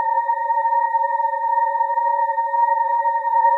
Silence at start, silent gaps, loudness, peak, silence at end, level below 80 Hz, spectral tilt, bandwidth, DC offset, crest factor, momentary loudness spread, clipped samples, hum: 0 s; none; -19 LUFS; -8 dBFS; 0 s; under -90 dBFS; 1 dB/octave; 4 kHz; under 0.1%; 12 dB; 2 LU; under 0.1%; none